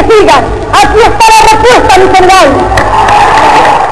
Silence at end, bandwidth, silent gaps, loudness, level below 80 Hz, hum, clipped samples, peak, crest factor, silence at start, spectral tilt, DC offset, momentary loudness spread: 0 s; 12 kHz; none; -3 LUFS; -20 dBFS; none; 30%; 0 dBFS; 4 dB; 0 s; -3.5 dB/octave; 10%; 4 LU